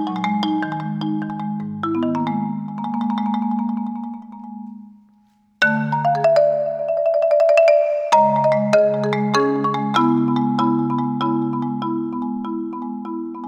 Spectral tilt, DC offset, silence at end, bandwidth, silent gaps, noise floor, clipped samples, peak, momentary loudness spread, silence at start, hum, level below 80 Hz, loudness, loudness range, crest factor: -6.5 dB/octave; under 0.1%; 0 s; 10.5 kHz; none; -57 dBFS; under 0.1%; -2 dBFS; 12 LU; 0 s; none; -70 dBFS; -19 LUFS; 7 LU; 16 dB